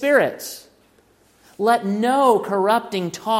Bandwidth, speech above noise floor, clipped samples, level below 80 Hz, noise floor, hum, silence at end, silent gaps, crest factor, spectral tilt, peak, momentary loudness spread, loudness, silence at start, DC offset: 16.5 kHz; 38 dB; under 0.1%; -68 dBFS; -57 dBFS; none; 0 s; none; 16 dB; -4.5 dB/octave; -4 dBFS; 14 LU; -19 LUFS; 0 s; under 0.1%